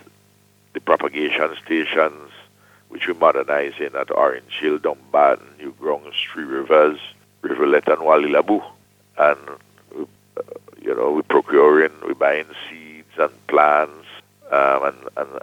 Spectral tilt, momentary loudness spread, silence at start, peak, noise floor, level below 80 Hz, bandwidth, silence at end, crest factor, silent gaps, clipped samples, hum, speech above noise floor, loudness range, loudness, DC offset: -5 dB/octave; 19 LU; 0.75 s; -2 dBFS; -56 dBFS; -68 dBFS; 16 kHz; 0.05 s; 18 dB; none; under 0.1%; 50 Hz at -60 dBFS; 38 dB; 3 LU; -19 LUFS; under 0.1%